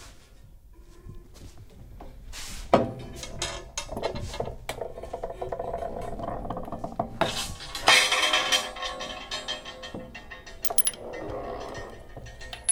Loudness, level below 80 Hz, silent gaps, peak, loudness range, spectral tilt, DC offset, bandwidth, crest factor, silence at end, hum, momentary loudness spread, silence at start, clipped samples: -27 LUFS; -46 dBFS; none; -6 dBFS; 10 LU; -2 dB/octave; under 0.1%; 18 kHz; 26 dB; 0 s; none; 22 LU; 0 s; under 0.1%